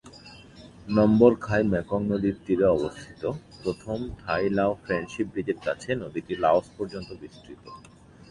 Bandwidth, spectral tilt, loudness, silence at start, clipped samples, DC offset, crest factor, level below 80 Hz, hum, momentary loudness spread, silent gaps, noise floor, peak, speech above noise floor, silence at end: 11 kHz; -7.5 dB/octave; -26 LUFS; 0.05 s; under 0.1%; under 0.1%; 22 dB; -50 dBFS; none; 24 LU; none; -48 dBFS; -4 dBFS; 22 dB; 0.5 s